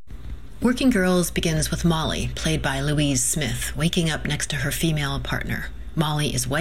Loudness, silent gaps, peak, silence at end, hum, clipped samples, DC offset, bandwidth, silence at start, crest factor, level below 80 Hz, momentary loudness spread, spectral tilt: -23 LUFS; none; -8 dBFS; 0 s; none; under 0.1%; 2%; 16 kHz; 0.1 s; 16 dB; -36 dBFS; 7 LU; -4 dB/octave